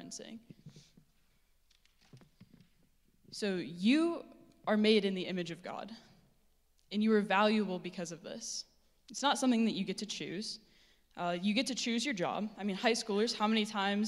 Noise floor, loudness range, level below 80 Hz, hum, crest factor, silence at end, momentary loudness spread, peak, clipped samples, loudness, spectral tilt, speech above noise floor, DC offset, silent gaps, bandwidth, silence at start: -70 dBFS; 4 LU; -74 dBFS; none; 22 dB; 0 s; 17 LU; -14 dBFS; under 0.1%; -33 LUFS; -4 dB/octave; 37 dB; under 0.1%; none; 12.5 kHz; 0 s